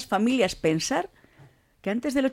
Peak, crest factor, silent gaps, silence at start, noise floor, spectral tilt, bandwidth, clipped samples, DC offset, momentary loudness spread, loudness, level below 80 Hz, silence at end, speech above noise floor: -10 dBFS; 16 dB; none; 0 s; -56 dBFS; -4.5 dB/octave; 16 kHz; under 0.1%; under 0.1%; 10 LU; -26 LUFS; -56 dBFS; 0 s; 31 dB